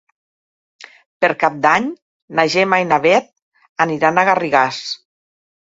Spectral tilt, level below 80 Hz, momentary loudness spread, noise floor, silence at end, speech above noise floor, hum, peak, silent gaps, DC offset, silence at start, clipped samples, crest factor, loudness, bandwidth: -4.5 dB/octave; -62 dBFS; 12 LU; under -90 dBFS; 0.7 s; over 75 dB; none; 0 dBFS; 1.06-1.20 s, 2.02-2.28 s, 3.42-3.52 s, 3.69-3.76 s; under 0.1%; 0.8 s; under 0.1%; 18 dB; -16 LUFS; 7.8 kHz